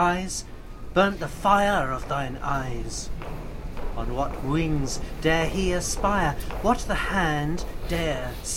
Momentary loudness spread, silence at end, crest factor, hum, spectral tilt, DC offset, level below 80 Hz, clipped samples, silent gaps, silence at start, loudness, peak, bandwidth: 13 LU; 0 s; 18 dB; none; -4.5 dB/octave; under 0.1%; -34 dBFS; under 0.1%; none; 0 s; -26 LUFS; -6 dBFS; 16.5 kHz